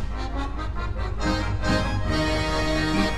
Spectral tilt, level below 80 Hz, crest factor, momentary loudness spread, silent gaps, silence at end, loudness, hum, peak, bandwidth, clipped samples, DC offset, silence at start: -5.5 dB/octave; -30 dBFS; 16 dB; 7 LU; none; 0 s; -26 LUFS; none; -8 dBFS; 12 kHz; under 0.1%; under 0.1%; 0 s